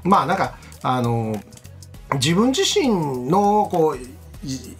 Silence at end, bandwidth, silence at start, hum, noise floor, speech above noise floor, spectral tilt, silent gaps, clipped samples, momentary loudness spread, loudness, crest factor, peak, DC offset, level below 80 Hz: 0.05 s; 16 kHz; 0 s; none; -40 dBFS; 21 dB; -5 dB/octave; none; under 0.1%; 14 LU; -20 LUFS; 18 dB; -2 dBFS; under 0.1%; -46 dBFS